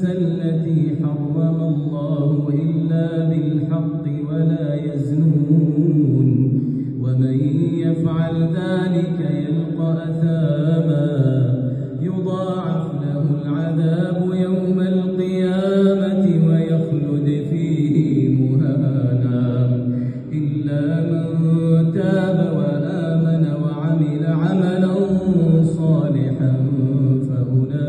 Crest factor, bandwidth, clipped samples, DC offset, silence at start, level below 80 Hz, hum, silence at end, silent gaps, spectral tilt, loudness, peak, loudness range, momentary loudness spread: 14 dB; 4.4 kHz; under 0.1%; under 0.1%; 0 s; -52 dBFS; none; 0 s; none; -10 dB/octave; -19 LUFS; -4 dBFS; 2 LU; 6 LU